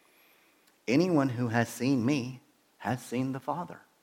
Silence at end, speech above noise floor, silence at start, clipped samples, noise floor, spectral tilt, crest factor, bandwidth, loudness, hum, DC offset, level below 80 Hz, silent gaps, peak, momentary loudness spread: 0.25 s; 36 dB; 0.9 s; under 0.1%; -65 dBFS; -6.5 dB/octave; 20 dB; 16.5 kHz; -30 LUFS; none; under 0.1%; -74 dBFS; none; -12 dBFS; 15 LU